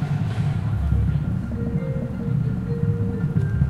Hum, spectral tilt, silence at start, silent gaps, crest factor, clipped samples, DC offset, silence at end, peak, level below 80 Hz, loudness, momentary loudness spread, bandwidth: none; -9.5 dB/octave; 0 s; none; 16 dB; under 0.1%; under 0.1%; 0 s; -8 dBFS; -32 dBFS; -24 LUFS; 4 LU; 8.6 kHz